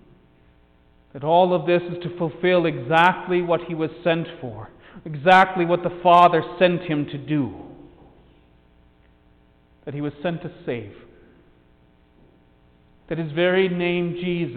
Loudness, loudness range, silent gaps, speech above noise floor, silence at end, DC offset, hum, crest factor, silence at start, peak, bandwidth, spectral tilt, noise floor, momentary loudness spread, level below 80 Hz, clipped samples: -21 LUFS; 15 LU; none; 36 dB; 0 s; under 0.1%; none; 20 dB; 1.15 s; -2 dBFS; 9 kHz; -7.5 dB/octave; -56 dBFS; 19 LU; -56 dBFS; under 0.1%